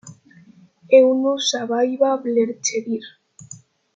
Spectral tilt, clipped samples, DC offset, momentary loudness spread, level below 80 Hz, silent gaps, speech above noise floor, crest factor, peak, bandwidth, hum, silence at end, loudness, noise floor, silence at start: -3 dB/octave; under 0.1%; under 0.1%; 15 LU; -74 dBFS; none; 32 dB; 18 dB; -2 dBFS; 7.8 kHz; none; 0.4 s; -19 LUFS; -50 dBFS; 0.05 s